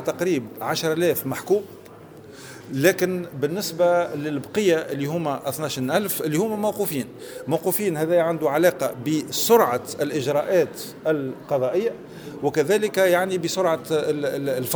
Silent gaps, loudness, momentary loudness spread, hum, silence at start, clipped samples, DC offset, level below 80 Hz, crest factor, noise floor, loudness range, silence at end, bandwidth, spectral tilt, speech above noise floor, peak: none; -23 LUFS; 8 LU; none; 0 s; under 0.1%; under 0.1%; -64 dBFS; 20 dB; -43 dBFS; 3 LU; 0 s; over 20 kHz; -4.5 dB/octave; 21 dB; -4 dBFS